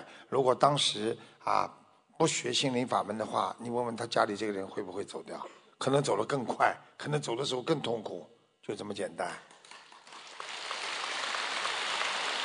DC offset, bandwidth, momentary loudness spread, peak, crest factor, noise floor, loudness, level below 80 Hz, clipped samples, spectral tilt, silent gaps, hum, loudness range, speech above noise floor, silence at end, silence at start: under 0.1%; 10.5 kHz; 15 LU; -10 dBFS; 24 dB; -53 dBFS; -32 LUFS; -78 dBFS; under 0.1%; -3.5 dB/octave; none; none; 7 LU; 22 dB; 0 s; 0 s